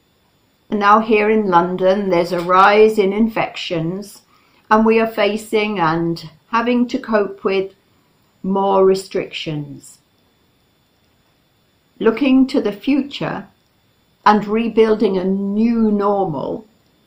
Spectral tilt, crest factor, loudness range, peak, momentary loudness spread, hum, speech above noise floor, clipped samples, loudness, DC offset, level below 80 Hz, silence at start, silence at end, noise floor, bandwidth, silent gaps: -6.5 dB/octave; 18 dB; 7 LU; 0 dBFS; 12 LU; none; 43 dB; under 0.1%; -16 LUFS; under 0.1%; -50 dBFS; 0.7 s; 0.45 s; -59 dBFS; 16 kHz; none